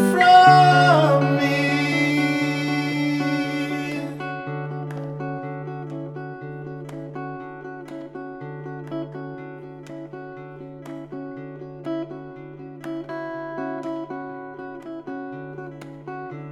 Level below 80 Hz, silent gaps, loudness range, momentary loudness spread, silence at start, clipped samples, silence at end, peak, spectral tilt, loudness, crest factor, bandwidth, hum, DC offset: -62 dBFS; none; 16 LU; 21 LU; 0 s; under 0.1%; 0 s; -2 dBFS; -6 dB/octave; -20 LUFS; 20 dB; 15 kHz; none; under 0.1%